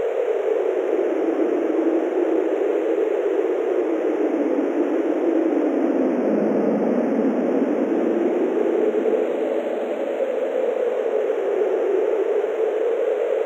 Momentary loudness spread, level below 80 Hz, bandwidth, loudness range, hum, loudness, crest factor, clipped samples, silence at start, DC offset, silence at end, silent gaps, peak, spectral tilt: 2 LU; -80 dBFS; 8 kHz; 2 LU; none; -21 LUFS; 14 dB; under 0.1%; 0 s; under 0.1%; 0 s; none; -8 dBFS; -7 dB/octave